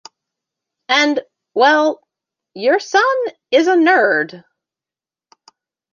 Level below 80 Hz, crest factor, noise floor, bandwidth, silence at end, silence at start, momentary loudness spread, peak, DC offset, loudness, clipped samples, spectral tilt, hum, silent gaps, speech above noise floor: -76 dBFS; 16 dB; under -90 dBFS; 7.4 kHz; 1.55 s; 0.9 s; 11 LU; 0 dBFS; under 0.1%; -15 LUFS; under 0.1%; -3 dB/octave; none; none; over 76 dB